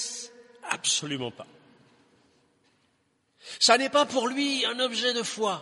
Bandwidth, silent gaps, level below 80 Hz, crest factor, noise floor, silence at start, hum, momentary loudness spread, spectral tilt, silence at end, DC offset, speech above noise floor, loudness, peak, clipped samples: 11.5 kHz; none; -80 dBFS; 26 dB; -71 dBFS; 0 s; none; 18 LU; -1.5 dB/octave; 0 s; under 0.1%; 45 dB; -25 LUFS; -4 dBFS; under 0.1%